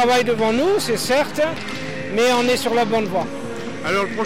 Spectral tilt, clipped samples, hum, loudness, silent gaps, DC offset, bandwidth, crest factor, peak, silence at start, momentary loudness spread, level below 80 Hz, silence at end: -4 dB/octave; under 0.1%; none; -20 LUFS; none; 2%; 16.5 kHz; 10 dB; -10 dBFS; 0 s; 11 LU; -52 dBFS; 0 s